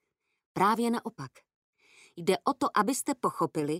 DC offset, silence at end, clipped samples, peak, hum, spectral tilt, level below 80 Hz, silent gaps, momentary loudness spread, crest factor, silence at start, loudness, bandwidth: under 0.1%; 0 s; under 0.1%; -12 dBFS; none; -4.5 dB/octave; -74 dBFS; 1.54-1.73 s; 15 LU; 20 dB; 0.55 s; -29 LUFS; 16 kHz